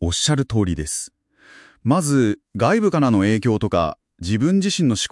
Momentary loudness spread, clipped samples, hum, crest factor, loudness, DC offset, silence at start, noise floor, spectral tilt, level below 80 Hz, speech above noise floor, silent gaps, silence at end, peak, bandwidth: 9 LU; under 0.1%; none; 16 dB; -19 LUFS; under 0.1%; 0 s; -49 dBFS; -5 dB/octave; -44 dBFS; 30 dB; none; 0.05 s; -4 dBFS; 12 kHz